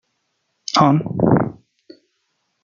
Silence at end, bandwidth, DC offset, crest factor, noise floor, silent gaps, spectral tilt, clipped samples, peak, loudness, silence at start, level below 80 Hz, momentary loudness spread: 1.1 s; 7.4 kHz; under 0.1%; 18 dB; -71 dBFS; none; -6.5 dB/octave; under 0.1%; -2 dBFS; -17 LUFS; 0.75 s; -52 dBFS; 11 LU